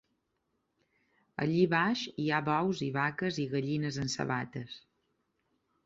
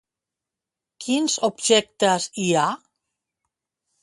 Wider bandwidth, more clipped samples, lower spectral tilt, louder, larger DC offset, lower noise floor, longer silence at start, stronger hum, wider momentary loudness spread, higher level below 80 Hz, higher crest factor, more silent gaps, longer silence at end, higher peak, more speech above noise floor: second, 8 kHz vs 11.5 kHz; neither; first, -5.5 dB/octave vs -3 dB/octave; second, -32 LUFS vs -21 LUFS; neither; second, -80 dBFS vs -87 dBFS; first, 1.4 s vs 1 s; neither; first, 14 LU vs 7 LU; about the same, -68 dBFS vs -70 dBFS; about the same, 20 dB vs 20 dB; neither; second, 1.05 s vs 1.25 s; second, -14 dBFS vs -4 dBFS; second, 48 dB vs 66 dB